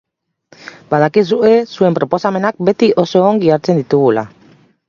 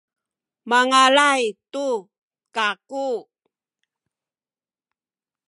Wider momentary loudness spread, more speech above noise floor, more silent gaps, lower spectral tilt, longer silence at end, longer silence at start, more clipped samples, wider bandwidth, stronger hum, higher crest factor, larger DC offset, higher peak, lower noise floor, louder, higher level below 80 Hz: second, 5 LU vs 14 LU; second, 38 dB vs over 71 dB; second, none vs 2.18-2.28 s; first, -7.5 dB/octave vs -1 dB/octave; second, 0.6 s vs 2.25 s; about the same, 0.65 s vs 0.65 s; neither; second, 7.2 kHz vs 11.5 kHz; neither; second, 14 dB vs 22 dB; neither; about the same, 0 dBFS vs -2 dBFS; second, -50 dBFS vs under -90 dBFS; first, -13 LUFS vs -19 LUFS; first, -56 dBFS vs -84 dBFS